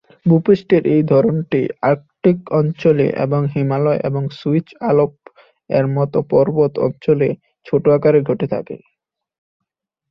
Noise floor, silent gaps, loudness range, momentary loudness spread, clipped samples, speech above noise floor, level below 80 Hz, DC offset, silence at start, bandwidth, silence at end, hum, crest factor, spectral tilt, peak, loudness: -47 dBFS; none; 3 LU; 7 LU; under 0.1%; 31 dB; -54 dBFS; under 0.1%; 0.25 s; 6 kHz; 1.35 s; none; 16 dB; -10.5 dB/octave; -2 dBFS; -17 LUFS